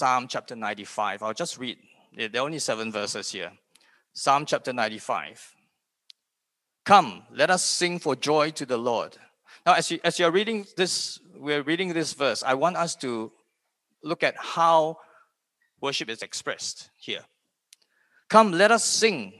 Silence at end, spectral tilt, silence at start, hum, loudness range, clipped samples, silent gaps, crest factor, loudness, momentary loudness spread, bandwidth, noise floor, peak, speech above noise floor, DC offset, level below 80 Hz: 0.1 s; -3 dB/octave; 0 s; none; 6 LU; under 0.1%; none; 26 dB; -25 LUFS; 15 LU; 12.5 kHz; -83 dBFS; -2 dBFS; 58 dB; under 0.1%; -78 dBFS